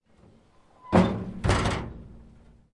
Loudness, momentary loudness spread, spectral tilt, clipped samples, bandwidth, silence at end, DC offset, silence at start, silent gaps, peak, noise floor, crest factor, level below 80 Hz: -26 LUFS; 16 LU; -6.5 dB/octave; under 0.1%; 11.5 kHz; 0.5 s; under 0.1%; 0.85 s; none; -6 dBFS; -58 dBFS; 22 dB; -40 dBFS